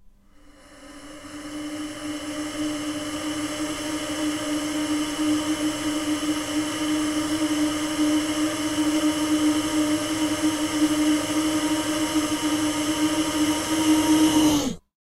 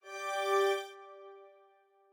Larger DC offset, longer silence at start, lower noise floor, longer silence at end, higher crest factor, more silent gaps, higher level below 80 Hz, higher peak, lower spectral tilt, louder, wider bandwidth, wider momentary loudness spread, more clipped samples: neither; about the same, 0.05 s vs 0.05 s; second, -51 dBFS vs -66 dBFS; second, 0.3 s vs 0.65 s; about the same, 16 dB vs 18 dB; neither; first, -50 dBFS vs under -90 dBFS; first, -8 dBFS vs -20 dBFS; first, -3 dB/octave vs 0.5 dB/octave; first, -24 LUFS vs -32 LUFS; second, 16 kHz vs 20 kHz; second, 10 LU vs 22 LU; neither